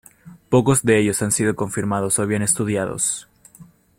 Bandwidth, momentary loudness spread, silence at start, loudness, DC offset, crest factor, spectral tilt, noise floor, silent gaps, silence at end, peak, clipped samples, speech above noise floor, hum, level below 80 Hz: 16.5 kHz; 7 LU; 0.25 s; -19 LUFS; under 0.1%; 18 dB; -4.5 dB/octave; -48 dBFS; none; 0.35 s; -4 dBFS; under 0.1%; 29 dB; none; -52 dBFS